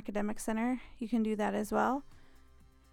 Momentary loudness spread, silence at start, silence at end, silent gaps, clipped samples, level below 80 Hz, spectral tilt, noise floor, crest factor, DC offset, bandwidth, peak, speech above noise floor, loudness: 6 LU; 0 s; 0.55 s; none; under 0.1%; -56 dBFS; -5.5 dB/octave; -60 dBFS; 18 dB; under 0.1%; 17 kHz; -18 dBFS; 26 dB; -34 LUFS